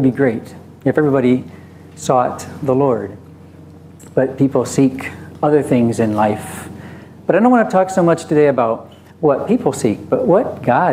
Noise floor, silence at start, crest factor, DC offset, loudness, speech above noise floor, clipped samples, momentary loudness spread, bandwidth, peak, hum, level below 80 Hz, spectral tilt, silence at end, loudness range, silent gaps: -39 dBFS; 0 s; 16 dB; under 0.1%; -16 LUFS; 24 dB; under 0.1%; 14 LU; 15.5 kHz; 0 dBFS; none; -60 dBFS; -7 dB/octave; 0 s; 4 LU; none